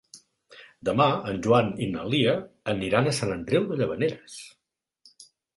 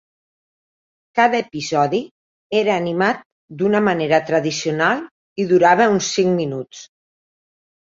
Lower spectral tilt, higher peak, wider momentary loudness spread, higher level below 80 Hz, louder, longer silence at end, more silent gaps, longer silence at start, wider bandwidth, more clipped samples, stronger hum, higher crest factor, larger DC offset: about the same, -5.5 dB/octave vs -4.5 dB/octave; second, -6 dBFS vs -2 dBFS; about the same, 9 LU vs 11 LU; first, -56 dBFS vs -62 dBFS; second, -25 LUFS vs -18 LUFS; second, 0.3 s vs 0.95 s; second, none vs 2.11-2.50 s, 3.25-3.48 s, 5.11-5.36 s; second, 0.15 s vs 1.15 s; first, 11.5 kHz vs 7.8 kHz; neither; neither; about the same, 20 dB vs 18 dB; neither